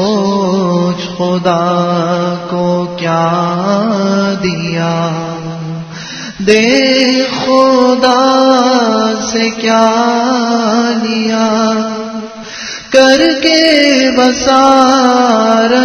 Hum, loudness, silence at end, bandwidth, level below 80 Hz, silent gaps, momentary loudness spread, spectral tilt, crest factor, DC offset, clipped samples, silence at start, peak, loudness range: none; -10 LUFS; 0 s; 11 kHz; -48 dBFS; none; 13 LU; -4.5 dB/octave; 10 dB; under 0.1%; 0.4%; 0 s; 0 dBFS; 5 LU